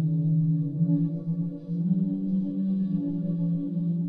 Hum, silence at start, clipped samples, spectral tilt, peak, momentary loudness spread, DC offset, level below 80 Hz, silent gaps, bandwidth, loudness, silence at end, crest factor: none; 0 s; under 0.1%; -13.5 dB/octave; -14 dBFS; 5 LU; under 0.1%; -60 dBFS; none; 1.2 kHz; -27 LUFS; 0 s; 12 dB